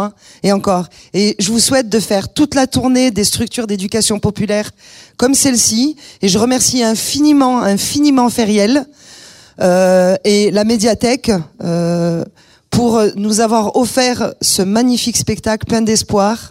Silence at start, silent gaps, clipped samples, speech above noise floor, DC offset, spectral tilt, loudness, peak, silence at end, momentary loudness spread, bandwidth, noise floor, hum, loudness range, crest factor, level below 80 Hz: 0 s; none; under 0.1%; 26 dB; under 0.1%; -4 dB/octave; -13 LUFS; 0 dBFS; 0 s; 7 LU; 16 kHz; -39 dBFS; none; 2 LU; 12 dB; -42 dBFS